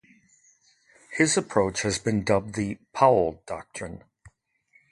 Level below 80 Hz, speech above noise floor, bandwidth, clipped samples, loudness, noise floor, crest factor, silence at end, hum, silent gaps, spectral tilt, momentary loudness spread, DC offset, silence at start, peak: -54 dBFS; 40 dB; 11.5 kHz; under 0.1%; -24 LUFS; -64 dBFS; 22 dB; 0.65 s; none; none; -4.5 dB/octave; 17 LU; under 0.1%; 1.1 s; -4 dBFS